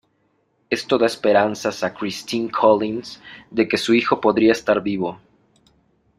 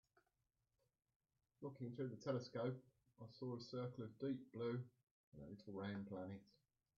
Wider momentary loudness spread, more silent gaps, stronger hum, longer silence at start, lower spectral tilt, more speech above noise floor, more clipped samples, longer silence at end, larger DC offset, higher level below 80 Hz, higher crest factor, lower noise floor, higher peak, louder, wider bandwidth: about the same, 11 LU vs 13 LU; second, none vs 5.03-5.32 s; neither; second, 0.7 s vs 1.6 s; second, -5 dB/octave vs -7 dB/octave; first, 46 dB vs 41 dB; neither; first, 1.05 s vs 0.45 s; neither; first, -60 dBFS vs -84 dBFS; about the same, 18 dB vs 20 dB; second, -66 dBFS vs -90 dBFS; first, -2 dBFS vs -32 dBFS; first, -20 LUFS vs -50 LUFS; first, 14.5 kHz vs 7 kHz